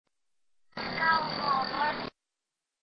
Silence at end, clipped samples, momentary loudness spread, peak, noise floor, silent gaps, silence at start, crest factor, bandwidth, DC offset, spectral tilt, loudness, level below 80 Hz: 0.75 s; under 0.1%; 14 LU; -14 dBFS; -88 dBFS; none; 0.75 s; 20 dB; 6.2 kHz; under 0.1%; -5.5 dB/octave; -29 LUFS; -64 dBFS